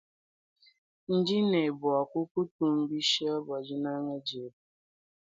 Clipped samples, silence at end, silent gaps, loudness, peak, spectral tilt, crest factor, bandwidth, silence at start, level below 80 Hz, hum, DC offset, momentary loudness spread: under 0.1%; 0.8 s; 2.31-2.35 s, 2.51-2.59 s; -30 LUFS; -14 dBFS; -5 dB/octave; 18 dB; 9.2 kHz; 1.1 s; -76 dBFS; none; under 0.1%; 10 LU